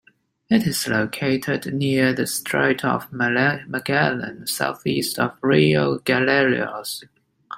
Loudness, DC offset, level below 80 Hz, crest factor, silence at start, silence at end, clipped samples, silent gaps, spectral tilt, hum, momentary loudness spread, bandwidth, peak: -21 LUFS; under 0.1%; -58 dBFS; 18 dB; 0.5 s; 0 s; under 0.1%; none; -4.5 dB/octave; none; 8 LU; 16 kHz; -2 dBFS